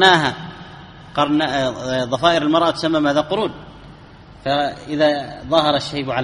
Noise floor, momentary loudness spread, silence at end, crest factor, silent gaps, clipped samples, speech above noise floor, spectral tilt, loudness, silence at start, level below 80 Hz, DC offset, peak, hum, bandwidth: -42 dBFS; 15 LU; 0 s; 18 dB; none; under 0.1%; 24 dB; -5 dB/octave; -18 LUFS; 0 s; -48 dBFS; under 0.1%; 0 dBFS; none; 11 kHz